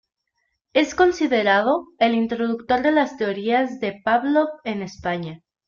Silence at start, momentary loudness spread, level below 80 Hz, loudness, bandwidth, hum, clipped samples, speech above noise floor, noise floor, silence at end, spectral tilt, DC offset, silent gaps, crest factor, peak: 0.75 s; 9 LU; -56 dBFS; -21 LUFS; 7.4 kHz; none; under 0.1%; 54 dB; -74 dBFS; 0.3 s; -5 dB/octave; under 0.1%; none; 18 dB; -4 dBFS